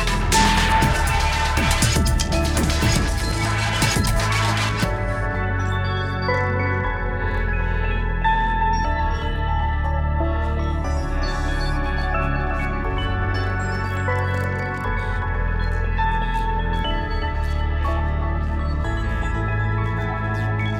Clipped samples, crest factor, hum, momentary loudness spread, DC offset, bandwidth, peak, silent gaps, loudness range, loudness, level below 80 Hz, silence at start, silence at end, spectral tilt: under 0.1%; 16 dB; none; 6 LU; under 0.1%; 18.5 kHz; -4 dBFS; none; 4 LU; -22 LUFS; -24 dBFS; 0 s; 0 s; -4.5 dB/octave